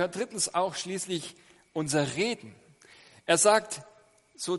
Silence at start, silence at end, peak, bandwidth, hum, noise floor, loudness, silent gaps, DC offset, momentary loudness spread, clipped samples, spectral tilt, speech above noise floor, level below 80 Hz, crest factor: 0 s; 0 s; -8 dBFS; 11.5 kHz; none; -56 dBFS; -28 LUFS; none; under 0.1%; 17 LU; under 0.1%; -3 dB/octave; 28 dB; -72 dBFS; 22 dB